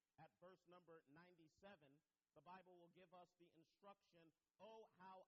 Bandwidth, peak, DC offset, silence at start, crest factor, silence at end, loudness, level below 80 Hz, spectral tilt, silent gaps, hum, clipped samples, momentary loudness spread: 6.6 kHz; -52 dBFS; under 0.1%; 0.2 s; 18 dB; 0 s; -68 LUFS; under -90 dBFS; -4 dB/octave; none; none; under 0.1%; 4 LU